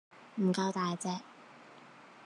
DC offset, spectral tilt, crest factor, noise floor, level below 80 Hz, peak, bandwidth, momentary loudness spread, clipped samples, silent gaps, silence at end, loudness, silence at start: under 0.1%; -5.5 dB/octave; 16 dB; -55 dBFS; -90 dBFS; -20 dBFS; 11 kHz; 23 LU; under 0.1%; none; 0 s; -34 LUFS; 0.15 s